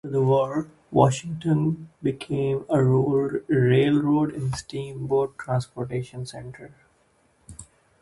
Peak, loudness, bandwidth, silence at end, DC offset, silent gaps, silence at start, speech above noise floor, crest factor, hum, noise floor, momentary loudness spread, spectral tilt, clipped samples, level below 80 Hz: -4 dBFS; -24 LUFS; 11.5 kHz; 0.4 s; under 0.1%; none; 0.05 s; 40 dB; 20 dB; none; -63 dBFS; 14 LU; -7.5 dB/octave; under 0.1%; -54 dBFS